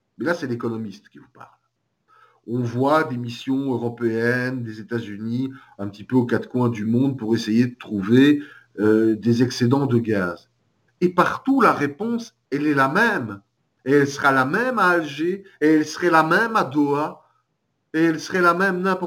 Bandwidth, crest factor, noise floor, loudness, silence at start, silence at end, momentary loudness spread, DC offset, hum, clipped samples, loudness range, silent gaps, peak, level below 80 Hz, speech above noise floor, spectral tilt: 17 kHz; 18 dB; -73 dBFS; -21 LUFS; 0.2 s; 0 s; 12 LU; under 0.1%; none; under 0.1%; 5 LU; none; -4 dBFS; -66 dBFS; 52 dB; -6.5 dB/octave